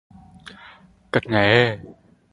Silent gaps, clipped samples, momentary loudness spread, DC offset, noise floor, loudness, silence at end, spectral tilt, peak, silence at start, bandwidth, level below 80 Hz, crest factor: none; under 0.1%; 25 LU; under 0.1%; -49 dBFS; -19 LUFS; 0.4 s; -6.5 dB/octave; 0 dBFS; 0.45 s; 11.5 kHz; -52 dBFS; 24 dB